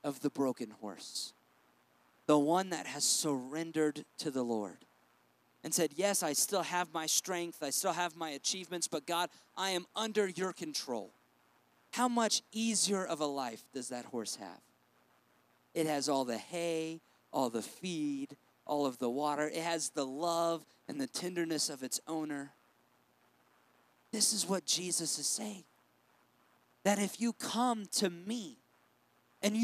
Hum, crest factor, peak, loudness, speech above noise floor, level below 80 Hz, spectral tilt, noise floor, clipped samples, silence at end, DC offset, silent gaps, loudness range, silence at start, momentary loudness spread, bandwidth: none; 22 dB; -14 dBFS; -35 LUFS; 36 dB; under -90 dBFS; -2.5 dB/octave; -71 dBFS; under 0.1%; 0 s; under 0.1%; none; 4 LU; 0.05 s; 12 LU; 15.5 kHz